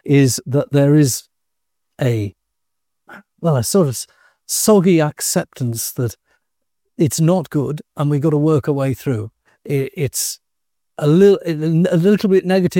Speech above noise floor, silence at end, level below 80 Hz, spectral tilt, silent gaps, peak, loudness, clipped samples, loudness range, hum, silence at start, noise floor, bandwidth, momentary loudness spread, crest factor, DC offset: 65 dB; 0 s; -56 dBFS; -6 dB/octave; none; -2 dBFS; -17 LUFS; under 0.1%; 3 LU; none; 0.05 s; -81 dBFS; 17 kHz; 11 LU; 16 dB; under 0.1%